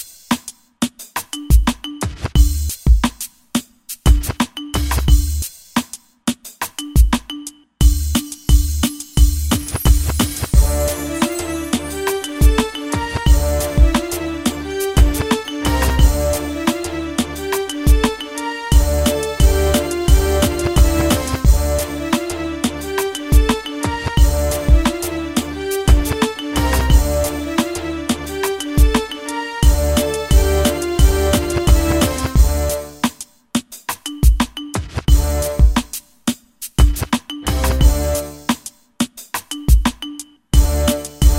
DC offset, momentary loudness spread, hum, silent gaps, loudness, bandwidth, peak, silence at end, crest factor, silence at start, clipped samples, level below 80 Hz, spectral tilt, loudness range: under 0.1%; 9 LU; none; none; -18 LUFS; 16.5 kHz; 0 dBFS; 0 s; 16 dB; 0 s; under 0.1%; -18 dBFS; -5 dB/octave; 3 LU